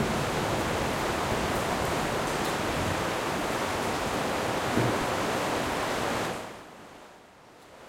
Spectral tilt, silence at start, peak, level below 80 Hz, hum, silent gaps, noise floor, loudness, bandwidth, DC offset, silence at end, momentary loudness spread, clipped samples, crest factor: -4 dB/octave; 0 s; -12 dBFS; -48 dBFS; none; none; -52 dBFS; -29 LUFS; 16.5 kHz; under 0.1%; 0 s; 7 LU; under 0.1%; 18 dB